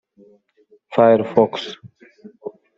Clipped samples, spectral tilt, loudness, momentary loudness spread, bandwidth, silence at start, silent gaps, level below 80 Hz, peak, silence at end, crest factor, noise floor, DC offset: under 0.1%; -7 dB/octave; -17 LUFS; 22 LU; 7.6 kHz; 0.9 s; none; -68 dBFS; -2 dBFS; 0.25 s; 18 dB; -57 dBFS; under 0.1%